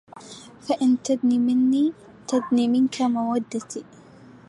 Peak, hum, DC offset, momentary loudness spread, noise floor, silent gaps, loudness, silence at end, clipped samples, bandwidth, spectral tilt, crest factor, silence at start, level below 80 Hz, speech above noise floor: -10 dBFS; none; under 0.1%; 19 LU; -47 dBFS; none; -22 LUFS; 0.65 s; under 0.1%; 11 kHz; -5 dB/octave; 14 dB; 0.15 s; -68 dBFS; 26 dB